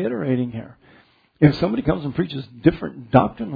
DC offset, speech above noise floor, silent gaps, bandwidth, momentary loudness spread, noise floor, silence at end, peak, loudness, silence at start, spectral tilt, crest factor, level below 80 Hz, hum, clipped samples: under 0.1%; 34 dB; none; 5 kHz; 10 LU; -55 dBFS; 0 s; 0 dBFS; -21 LUFS; 0 s; -10 dB/octave; 22 dB; -44 dBFS; none; under 0.1%